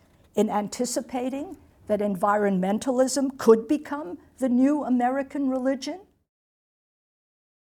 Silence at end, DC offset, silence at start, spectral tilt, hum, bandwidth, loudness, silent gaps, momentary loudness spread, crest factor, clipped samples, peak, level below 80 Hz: 1.65 s; under 0.1%; 0.35 s; -5.5 dB/octave; none; 17.5 kHz; -25 LUFS; none; 13 LU; 20 dB; under 0.1%; -6 dBFS; -64 dBFS